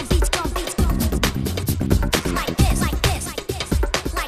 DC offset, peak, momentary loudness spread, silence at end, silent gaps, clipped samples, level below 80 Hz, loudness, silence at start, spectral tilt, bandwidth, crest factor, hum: 0.2%; -2 dBFS; 5 LU; 0 s; none; under 0.1%; -24 dBFS; -21 LUFS; 0 s; -4.5 dB/octave; 14 kHz; 18 dB; none